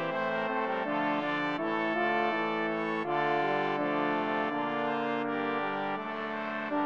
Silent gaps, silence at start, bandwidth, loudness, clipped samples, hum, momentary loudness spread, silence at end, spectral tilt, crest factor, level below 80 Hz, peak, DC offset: none; 0 s; 7.4 kHz; -31 LUFS; under 0.1%; none; 5 LU; 0 s; -6.5 dB/octave; 14 dB; -80 dBFS; -16 dBFS; under 0.1%